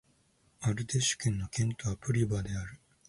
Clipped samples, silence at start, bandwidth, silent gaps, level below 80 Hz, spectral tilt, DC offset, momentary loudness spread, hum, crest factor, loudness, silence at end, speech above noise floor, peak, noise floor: under 0.1%; 0.6 s; 11.5 kHz; none; -52 dBFS; -4.5 dB/octave; under 0.1%; 8 LU; none; 16 dB; -32 LUFS; 0.3 s; 37 dB; -16 dBFS; -69 dBFS